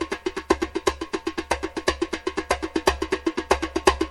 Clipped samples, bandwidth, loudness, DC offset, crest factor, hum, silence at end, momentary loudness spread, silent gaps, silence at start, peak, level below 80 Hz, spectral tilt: under 0.1%; 14 kHz; -25 LUFS; under 0.1%; 22 dB; none; 0 s; 7 LU; none; 0 s; -2 dBFS; -40 dBFS; -4 dB/octave